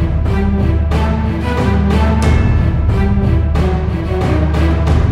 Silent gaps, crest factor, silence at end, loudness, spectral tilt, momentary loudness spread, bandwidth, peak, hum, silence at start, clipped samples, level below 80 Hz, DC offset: none; 12 dB; 0 s; -14 LUFS; -8 dB/octave; 4 LU; 10 kHz; 0 dBFS; none; 0 s; under 0.1%; -16 dBFS; under 0.1%